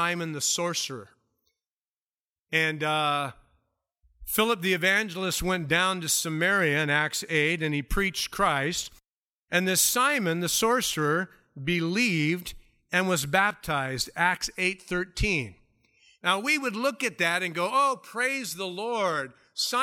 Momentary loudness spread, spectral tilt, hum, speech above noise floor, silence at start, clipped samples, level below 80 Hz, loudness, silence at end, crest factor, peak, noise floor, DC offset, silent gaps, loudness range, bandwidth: 8 LU; -3 dB/octave; none; over 63 dB; 0 s; under 0.1%; -46 dBFS; -26 LUFS; 0 s; 20 dB; -6 dBFS; under -90 dBFS; under 0.1%; 1.70-2.46 s, 9.11-9.48 s; 4 LU; 17 kHz